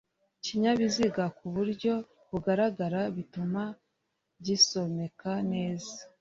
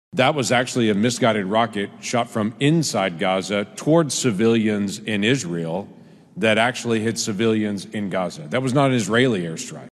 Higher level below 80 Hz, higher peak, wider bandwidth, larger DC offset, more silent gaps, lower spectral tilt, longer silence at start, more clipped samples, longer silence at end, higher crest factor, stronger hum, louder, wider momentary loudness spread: about the same, -64 dBFS vs -64 dBFS; second, -10 dBFS vs -4 dBFS; second, 7.8 kHz vs 12.5 kHz; neither; neither; about the same, -4.5 dB/octave vs -4.5 dB/octave; first, 0.45 s vs 0.15 s; neither; about the same, 0.15 s vs 0.1 s; about the same, 20 dB vs 18 dB; neither; second, -30 LUFS vs -21 LUFS; first, 14 LU vs 8 LU